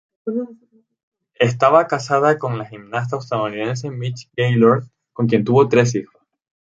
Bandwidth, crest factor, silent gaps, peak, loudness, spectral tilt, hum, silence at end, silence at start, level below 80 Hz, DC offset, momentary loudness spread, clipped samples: 7.8 kHz; 18 dB; 1.03-1.12 s; 0 dBFS; -18 LUFS; -6.5 dB/octave; none; 0.7 s; 0.25 s; -60 dBFS; under 0.1%; 13 LU; under 0.1%